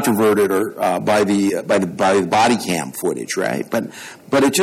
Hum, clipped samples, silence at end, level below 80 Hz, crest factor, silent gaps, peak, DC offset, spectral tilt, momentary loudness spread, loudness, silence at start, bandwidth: none; under 0.1%; 0 s; -58 dBFS; 12 dB; none; -6 dBFS; under 0.1%; -4.5 dB/octave; 8 LU; -18 LUFS; 0 s; 17 kHz